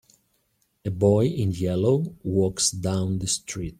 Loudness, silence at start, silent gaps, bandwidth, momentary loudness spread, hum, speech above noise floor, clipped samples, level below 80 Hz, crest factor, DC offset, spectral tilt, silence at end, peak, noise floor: -24 LUFS; 0.85 s; none; 15 kHz; 6 LU; none; 46 dB; under 0.1%; -52 dBFS; 18 dB; under 0.1%; -5.5 dB/octave; 0.05 s; -6 dBFS; -70 dBFS